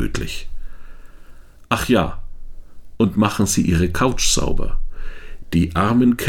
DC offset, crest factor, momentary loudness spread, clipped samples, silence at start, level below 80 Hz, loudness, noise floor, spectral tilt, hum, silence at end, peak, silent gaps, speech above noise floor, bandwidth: under 0.1%; 16 dB; 21 LU; under 0.1%; 0 s; -28 dBFS; -19 LUFS; -39 dBFS; -4.5 dB/octave; none; 0 s; -2 dBFS; none; 22 dB; 16.5 kHz